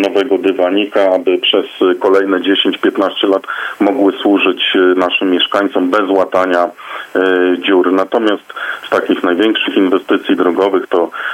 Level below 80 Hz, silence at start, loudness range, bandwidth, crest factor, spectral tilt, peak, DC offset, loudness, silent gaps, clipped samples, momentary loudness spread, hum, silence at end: -64 dBFS; 0 s; 1 LU; 14 kHz; 12 dB; -5 dB/octave; 0 dBFS; under 0.1%; -13 LUFS; none; under 0.1%; 5 LU; none; 0 s